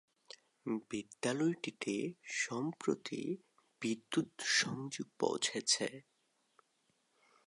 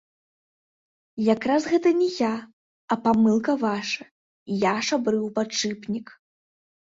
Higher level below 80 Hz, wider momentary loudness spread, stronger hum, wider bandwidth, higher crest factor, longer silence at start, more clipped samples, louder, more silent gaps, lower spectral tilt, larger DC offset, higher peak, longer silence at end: second, -84 dBFS vs -64 dBFS; about the same, 13 LU vs 11 LU; neither; first, 11.5 kHz vs 7.8 kHz; about the same, 22 dB vs 18 dB; second, 0.65 s vs 1.15 s; neither; second, -37 LUFS vs -24 LUFS; second, none vs 2.53-2.88 s, 4.11-4.46 s; second, -3 dB/octave vs -4.5 dB/octave; neither; second, -18 dBFS vs -8 dBFS; first, 1.45 s vs 0.9 s